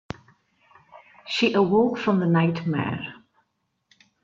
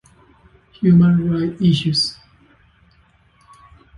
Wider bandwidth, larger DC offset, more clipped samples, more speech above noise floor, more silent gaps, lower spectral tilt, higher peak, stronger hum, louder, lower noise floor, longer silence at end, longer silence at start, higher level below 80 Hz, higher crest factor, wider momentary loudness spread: second, 7.4 kHz vs 11 kHz; neither; neither; first, 53 dB vs 40 dB; neither; about the same, -7 dB/octave vs -7 dB/octave; about the same, -6 dBFS vs -4 dBFS; neither; second, -23 LUFS vs -16 LUFS; first, -75 dBFS vs -55 dBFS; second, 1.1 s vs 1.85 s; first, 0.95 s vs 0.8 s; second, -62 dBFS vs -48 dBFS; about the same, 18 dB vs 16 dB; first, 20 LU vs 8 LU